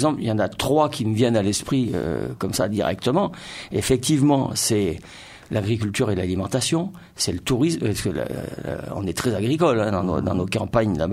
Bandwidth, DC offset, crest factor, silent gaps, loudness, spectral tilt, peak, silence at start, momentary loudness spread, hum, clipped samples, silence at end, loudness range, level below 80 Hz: 16 kHz; under 0.1%; 16 dB; none; -22 LUFS; -5 dB/octave; -6 dBFS; 0 s; 9 LU; none; under 0.1%; 0 s; 2 LU; -46 dBFS